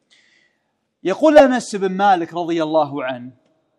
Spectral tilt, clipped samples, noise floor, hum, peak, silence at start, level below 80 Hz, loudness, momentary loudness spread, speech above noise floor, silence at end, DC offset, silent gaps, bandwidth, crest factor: -5 dB/octave; 0.2%; -70 dBFS; none; 0 dBFS; 1.05 s; -56 dBFS; -17 LUFS; 15 LU; 54 dB; 0.5 s; under 0.1%; none; 11 kHz; 18 dB